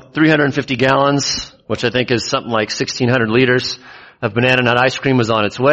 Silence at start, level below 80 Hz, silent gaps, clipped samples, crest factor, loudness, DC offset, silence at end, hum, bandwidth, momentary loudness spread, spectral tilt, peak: 0.15 s; -48 dBFS; none; under 0.1%; 16 dB; -15 LUFS; under 0.1%; 0 s; none; 8.4 kHz; 8 LU; -5 dB/octave; 0 dBFS